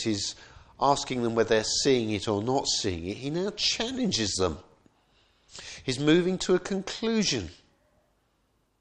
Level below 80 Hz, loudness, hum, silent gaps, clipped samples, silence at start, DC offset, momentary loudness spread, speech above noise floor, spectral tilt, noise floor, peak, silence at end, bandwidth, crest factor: -54 dBFS; -27 LUFS; none; none; under 0.1%; 0 s; under 0.1%; 11 LU; 44 dB; -4 dB/octave; -71 dBFS; -8 dBFS; 1.3 s; 10.5 kHz; 20 dB